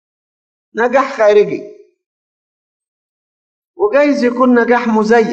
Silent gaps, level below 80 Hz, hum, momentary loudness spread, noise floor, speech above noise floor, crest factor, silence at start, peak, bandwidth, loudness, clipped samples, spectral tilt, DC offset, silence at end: 2.06-2.80 s, 2.88-3.74 s; -60 dBFS; none; 8 LU; under -90 dBFS; over 79 dB; 14 dB; 0.75 s; 0 dBFS; 8.2 kHz; -12 LUFS; under 0.1%; -6 dB/octave; under 0.1%; 0 s